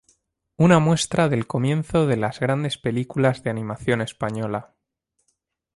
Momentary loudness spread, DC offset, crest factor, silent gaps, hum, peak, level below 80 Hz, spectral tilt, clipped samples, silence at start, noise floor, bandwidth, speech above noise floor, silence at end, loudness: 10 LU; under 0.1%; 20 dB; none; none; -2 dBFS; -52 dBFS; -6 dB/octave; under 0.1%; 0.6 s; -75 dBFS; 11.5 kHz; 54 dB; 1.15 s; -22 LUFS